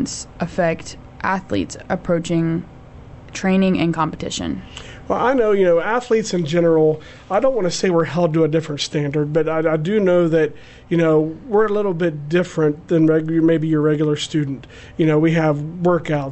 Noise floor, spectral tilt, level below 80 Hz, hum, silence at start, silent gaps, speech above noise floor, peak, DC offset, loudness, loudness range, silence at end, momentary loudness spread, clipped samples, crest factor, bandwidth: -39 dBFS; -6.5 dB/octave; -46 dBFS; none; 0 s; none; 21 dB; -6 dBFS; under 0.1%; -19 LUFS; 4 LU; 0 s; 10 LU; under 0.1%; 12 dB; 8.4 kHz